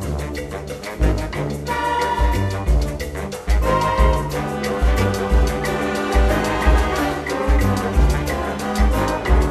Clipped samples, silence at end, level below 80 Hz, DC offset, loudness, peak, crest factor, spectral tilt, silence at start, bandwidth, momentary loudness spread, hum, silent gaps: under 0.1%; 0 s; -20 dBFS; under 0.1%; -20 LUFS; -4 dBFS; 16 dB; -6 dB/octave; 0 s; 14 kHz; 8 LU; none; none